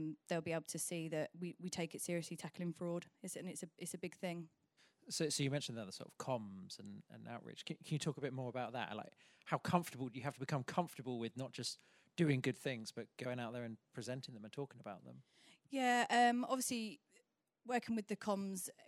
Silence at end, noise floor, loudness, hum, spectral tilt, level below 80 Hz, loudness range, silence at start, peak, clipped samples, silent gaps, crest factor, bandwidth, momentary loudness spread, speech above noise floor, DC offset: 0 s; -77 dBFS; -42 LUFS; none; -4.5 dB/octave; -86 dBFS; 7 LU; 0 s; -20 dBFS; under 0.1%; none; 24 dB; 16 kHz; 15 LU; 35 dB; under 0.1%